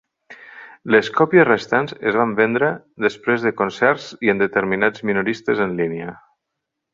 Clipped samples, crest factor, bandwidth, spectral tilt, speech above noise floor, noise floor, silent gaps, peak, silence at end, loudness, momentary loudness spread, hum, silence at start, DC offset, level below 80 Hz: under 0.1%; 18 dB; 7.6 kHz; -6.5 dB/octave; 61 dB; -80 dBFS; none; 0 dBFS; 0.8 s; -18 LUFS; 9 LU; none; 0.3 s; under 0.1%; -60 dBFS